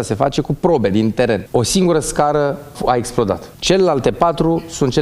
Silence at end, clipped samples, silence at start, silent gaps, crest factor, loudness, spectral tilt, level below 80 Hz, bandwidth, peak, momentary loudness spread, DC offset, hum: 0 s; under 0.1%; 0 s; none; 16 dB; -16 LUFS; -5 dB/octave; -38 dBFS; 15.5 kHz; 0 dBFS; 5 LU; under 0.1%; none